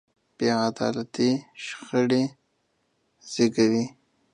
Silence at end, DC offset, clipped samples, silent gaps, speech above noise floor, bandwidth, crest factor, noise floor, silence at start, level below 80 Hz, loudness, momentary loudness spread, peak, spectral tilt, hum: 0.45 s; under 0.1%; under 0.1%; none; 48 dB; 10 kHz; 18 dB; -72 dBFS; 0.4 s; -70 dBFS; -25 LUFS; 13 LU; -8 dBFS; -5 dB/octave; none